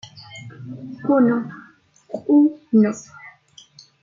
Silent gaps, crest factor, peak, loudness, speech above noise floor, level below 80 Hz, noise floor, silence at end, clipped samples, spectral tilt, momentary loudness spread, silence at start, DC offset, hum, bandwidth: none; 16 dB; -6 dBFS; -19 LUFS; 33 dB; -70 dBFS; -50 dBFS; 0.75 s; under 0.1%; -7 dB/octave; 22 LU; 0.15 s; under 0.1%; none; 7.4 kHz